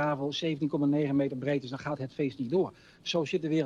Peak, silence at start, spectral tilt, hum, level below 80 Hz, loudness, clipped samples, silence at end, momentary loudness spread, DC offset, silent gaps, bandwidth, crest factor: -18 dBFS; 0 s; -6.5 dB/octave; none; -68 dBFS; -31 LUFS; under 0.1%; 0 s; 8 LU; under 0.1%; none; 7.6 kHz; 12 dB